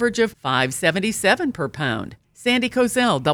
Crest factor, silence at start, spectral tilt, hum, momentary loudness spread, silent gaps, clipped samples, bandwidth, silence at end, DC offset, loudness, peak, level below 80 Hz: 18 dB; 0 s; -4 dB/octave; none; 7 LU; none; under 0.1%; 19.5 kHz; 0 s; under 0.1%; -20 LUFS; -2 dBFS; -54 dBFS